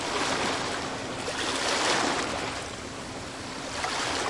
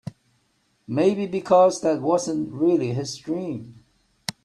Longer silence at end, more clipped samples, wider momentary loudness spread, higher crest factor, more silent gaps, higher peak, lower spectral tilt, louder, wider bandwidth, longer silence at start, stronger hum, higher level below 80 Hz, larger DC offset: second, 0 s vs 0.15 s; neither; second, 12 LU vs 16 LU; about the same, 20 dB vs 18 dB; neither; second, -10 dBFS vs -4 dBFS; second, -2 dB/octave vs -6 dB/octave; second, -29 LUFS vs -22 LUFS; about the same, 11.5 kHz vs 12.5 kHz; about the same, 0 s vs 0.05 s; neither; first, -54 dBFS vs -66 dBFS; neither